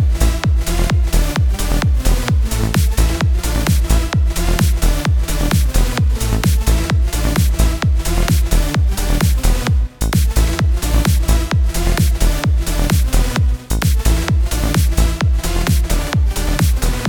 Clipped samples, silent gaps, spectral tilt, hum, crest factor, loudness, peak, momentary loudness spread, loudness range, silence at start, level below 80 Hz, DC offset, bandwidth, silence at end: under 0.1%; none; -5 dB/octave; none; 12 dB; -17 LUFS; 0 dBFS; 2 LU; 0 LU; 0 s; -16 dBFS; 0.4%; 19 kHz; 0 s